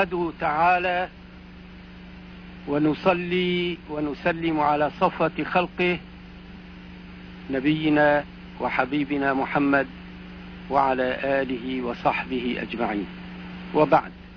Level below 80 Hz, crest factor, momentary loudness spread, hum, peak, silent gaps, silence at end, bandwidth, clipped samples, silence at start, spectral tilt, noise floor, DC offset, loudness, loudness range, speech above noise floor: -48 dBFS; 20 dB; 22 LU; 50 Hz at -50 dBFS; -4 dBFS; none; 0 s; 5.4 kHz; under 0.1%; 0 s; -8 dB/octave; -43 dBFS; under 0.1%; -24 LUFS; 2 LU; 20 dB